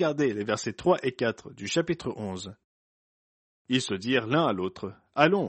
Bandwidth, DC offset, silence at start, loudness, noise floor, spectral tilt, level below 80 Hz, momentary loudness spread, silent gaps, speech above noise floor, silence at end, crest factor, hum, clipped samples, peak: 8.4 kHz; under 0.1%; 0 s; -28 LUFS; under -90 dBFS; -5 dB/octave; -64 dBFS; 12 LU; 2.64-3.65 s; over 63 dB; 0 s; 24 dB; none; under 0.1%; -4 dBFS